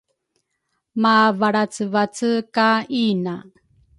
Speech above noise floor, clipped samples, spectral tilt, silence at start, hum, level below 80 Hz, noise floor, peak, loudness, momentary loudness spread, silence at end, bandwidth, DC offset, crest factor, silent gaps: 55 dB; under 0.1%; -5 dB/octave; 0.95 s; none; -66 dBFS; -74 dBFS; -4 dBFS; -19 LUFS; 11 LU; 0.6 s; 11.5 kHz; under 0.1%; 18 dB; none